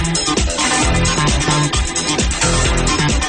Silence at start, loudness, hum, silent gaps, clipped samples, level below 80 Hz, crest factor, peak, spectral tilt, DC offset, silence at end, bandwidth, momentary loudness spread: 0 s; -15 LUFS; none; none; under 0.1%; -22 dBFS; 12 dB; -4 dBFS; -3 dB/octave; under 0.1%; 0 s; 10.5 kHz; 2 LU